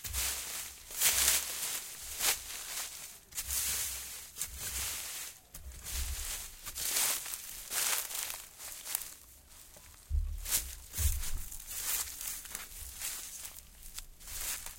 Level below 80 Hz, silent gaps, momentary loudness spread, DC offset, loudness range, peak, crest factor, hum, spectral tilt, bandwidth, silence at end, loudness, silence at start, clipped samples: -46 dBFS; none; 16 LU; under 0.1%; 6 LU; -10 dBFS; 28 dB; none; 0 dB/octave; 17 kHz; 0 s; -34 LUFS; 0 s; under 0.1%